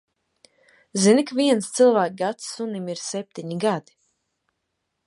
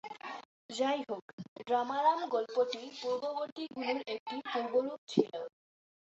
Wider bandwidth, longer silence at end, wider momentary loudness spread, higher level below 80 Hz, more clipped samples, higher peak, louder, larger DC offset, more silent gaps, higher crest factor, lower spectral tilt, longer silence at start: first, 11.5 kHz vs 8 kHz; first, 1.25 s vs 0.65 s; about the same, 13 LU vs 15 LU; first, -76 dBFS vs -82 dBFS; neither; first, -4 dBFS vs -14 dBFS; first, -22 LUFS vs -35 LUFS; neither; second, none vs 0.45-0.69 s, 1.22-1.38 s, 1.48-1.56 s, 3.52-3.56 s, 4.20-4.26 s, 4.98-5.07 s; about the same, 18 dB vs 22 dB; first, -4.5 dB/octave vs -3 dB/octave; first, 0.95 s vs 0.05 s